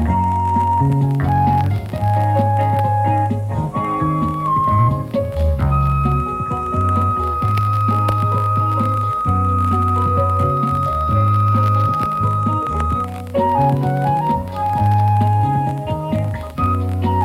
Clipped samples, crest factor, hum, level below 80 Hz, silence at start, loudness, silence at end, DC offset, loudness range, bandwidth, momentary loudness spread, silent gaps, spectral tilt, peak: under 0.1%; 14 dB; none; -30 dBFS; 0 s; -17 LUFS; 0 s; under 0.1%; 1 LU; 14 kHz; 5 LU; none; -9 dB/octave; -2 dBFS